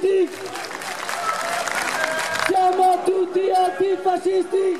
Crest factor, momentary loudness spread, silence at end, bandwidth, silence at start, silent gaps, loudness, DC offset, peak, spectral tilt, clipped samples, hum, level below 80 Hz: 14 dB; 10 LU; 0 s; 15 kHz; 0 s; none; -21 LUFS; 0.3%; -6 dBFS; -2.5 dB/octave; under 0.1%; none; -68 dBFS